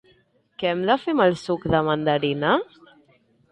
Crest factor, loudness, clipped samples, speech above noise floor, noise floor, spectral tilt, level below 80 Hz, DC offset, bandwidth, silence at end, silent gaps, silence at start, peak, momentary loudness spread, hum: 18 dB; -22 LUFS; under 0.1%; 40 dB; -61 dBFS; -6.5 dB/octave; -52 dBFS; under 0.1%; 11 kHz; 0.85 s; none; 0.6 s; -6 dBFS; 6 LU; none